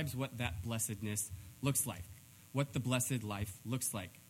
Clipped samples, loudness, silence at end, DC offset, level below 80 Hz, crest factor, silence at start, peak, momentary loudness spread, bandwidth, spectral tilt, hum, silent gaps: under 0.1%; -38 LUFS; 0 s; under 0.1%; -62 dBFS; 20 dB; 0 s; -18 dBFS; 8 LU; 17 kHz; -4 dB/octave; none; none